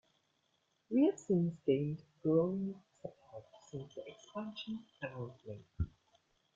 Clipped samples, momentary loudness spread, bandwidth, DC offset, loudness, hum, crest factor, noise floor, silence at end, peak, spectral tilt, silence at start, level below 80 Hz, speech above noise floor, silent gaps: under 0.1%; 20 LU; 7.8 kHz; under 0.1%; -37 LUFS; none; 20 dB; -79 dBFS; 0.7 s; -20 dBFS; -8 dB/octave; 0.9 s; -60 dBFS; 43 dB; none